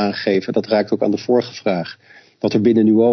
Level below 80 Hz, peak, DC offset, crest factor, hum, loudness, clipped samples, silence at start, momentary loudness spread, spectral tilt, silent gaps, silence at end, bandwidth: -60 dBFS; -2 dBFS; under 0.1%; 14 dB; none; -18 LUFS; under 0.1%; 0 s; 9 LU; -7 dB/octave; none; 0 s; 6.4 kHz